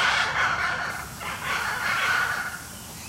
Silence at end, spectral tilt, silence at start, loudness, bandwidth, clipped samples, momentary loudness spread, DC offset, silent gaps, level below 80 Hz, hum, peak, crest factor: 0 s; -1.5 dB/octave; 0 s; -25 LUFS; 16 kHz; under 0.1%; 11 LU; under 0.1%; none; -52 dBFS; none; -10 dBFS; 18 dB